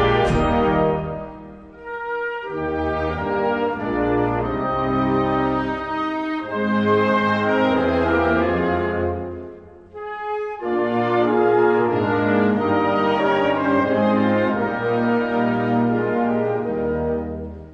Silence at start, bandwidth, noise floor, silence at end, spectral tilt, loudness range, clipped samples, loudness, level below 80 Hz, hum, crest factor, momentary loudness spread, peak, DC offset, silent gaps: 0 s; 9.2 kHz; -40 dBFS; 0 s; -8 dB/octave; 4 LU; under 0.1%; -20 LUFS; -40 dBFS; none; 14 dB; 11 LU; -6 dBFS; under 0.1%; none